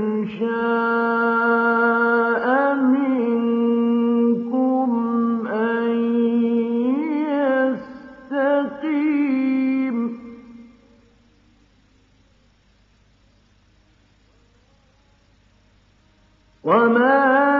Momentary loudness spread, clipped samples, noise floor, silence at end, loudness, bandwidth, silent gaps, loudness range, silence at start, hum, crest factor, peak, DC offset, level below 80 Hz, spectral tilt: 7 LU; under 0.1%; -58 dBFS; 0 s; -19 LUFS; 4.9 kHz; none; 8 LU; 0 s; none; 16 dB; -4 dBFS; under 0.1%; -64 dBFS; -8.5 dB/octave